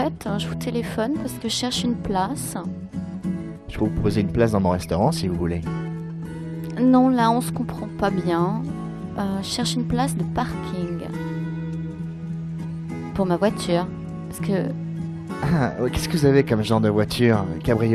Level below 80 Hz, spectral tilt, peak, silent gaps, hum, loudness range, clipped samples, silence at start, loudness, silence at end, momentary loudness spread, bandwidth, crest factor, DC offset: -44 dBFS; -6 dB/octave; -6 dBFS; none; none; 5 LU; under 0.1%; 0 s; -23 LUFS; 0 s; 12 LU; 14 kHz; 18 dB; under 0.1%